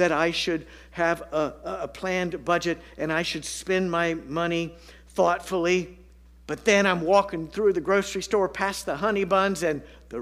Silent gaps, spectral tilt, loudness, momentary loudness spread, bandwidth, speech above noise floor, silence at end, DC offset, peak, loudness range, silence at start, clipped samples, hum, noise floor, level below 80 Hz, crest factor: none; -4.5 dB/octave; -25 LUFS; 10 LU; 15.5 kHz; 24 dB; 0 s; under 0.1%; -6 dBFS; 4 LU; 0 s; under 0.1%; none; -49 dBFS; -52 dBFS; 20 dB